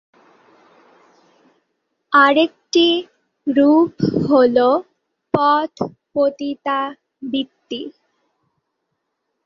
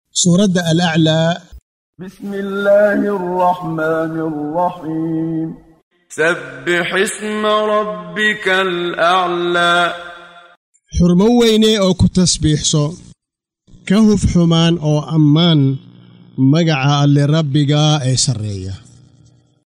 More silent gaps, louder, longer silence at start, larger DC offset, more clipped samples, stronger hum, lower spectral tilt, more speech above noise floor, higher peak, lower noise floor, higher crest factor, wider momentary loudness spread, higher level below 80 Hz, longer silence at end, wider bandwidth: second, none vs 1.62-1.93 s, 5.83-5.91 s, 10.57-10.73 s; second, -17 LUFS vs -14 LUFS; first, 2.1 s vs 0.15 s; neither; neither; neither; about the same, -5.5 dB/octave vs -5 dB/octave; second, 59 dB vs 68 dB; about the same, -2 dBFS vs -2 dBFS; second, -75 dBFS vs -82 dBFS; about the same, 18 dB vs 14 dB; about the same, 15 LU vs 13 LU; second, -60 dBFS vs -36 dBFS; first, 1.55 s vs 0.85 s; second, 7.2 kHz vs 13.5 kHz